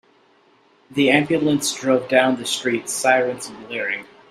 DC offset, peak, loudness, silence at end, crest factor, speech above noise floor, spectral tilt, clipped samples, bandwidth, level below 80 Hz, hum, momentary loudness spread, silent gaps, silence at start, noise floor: under 0.1%; 0 dBFS; -20 LUFS; 0.25 s; 20 dB; 37 dB; -3.5 dB/octave; under 0.1%; 15.5 kHz; -64 dBFS; none; 12 LU; none; 0.9 s; -56 dBFS